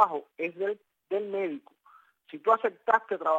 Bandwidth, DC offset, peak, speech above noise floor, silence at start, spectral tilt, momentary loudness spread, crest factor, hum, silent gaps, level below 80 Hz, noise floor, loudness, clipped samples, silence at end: 15.5 kHz; under 0.1%; -6 dBFS; 32 dB; 0 s; -6 dB/octave; 13 LU; 22 dB; none; none; under -90 dBFS; -60 dBFS; -29 LUFS; under 0.1%; 0 s